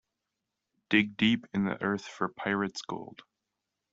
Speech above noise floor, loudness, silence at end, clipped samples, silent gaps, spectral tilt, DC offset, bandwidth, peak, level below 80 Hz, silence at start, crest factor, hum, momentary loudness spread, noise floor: 56 dB; -30 LUFS; 0.85 s; under 0.1%; none; -5 dB/octave; under 0.1%; 7.8 kHz; -8 dBFS; -68 dBFS; 0.9 s; 24 dB; none; 13 LU; -86 dBFS